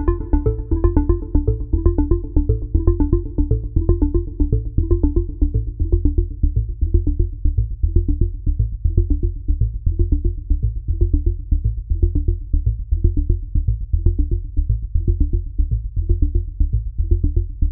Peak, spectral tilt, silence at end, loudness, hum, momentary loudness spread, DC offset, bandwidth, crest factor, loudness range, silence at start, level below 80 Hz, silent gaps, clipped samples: 0 dBFS; -16 dB/octave; 0 s; -21 LUFS; none; 4 LU; 0.4%; 1.8 kHz; 16 dB; 2 LU; 0 s; -20 dBFS; none; under 0.1%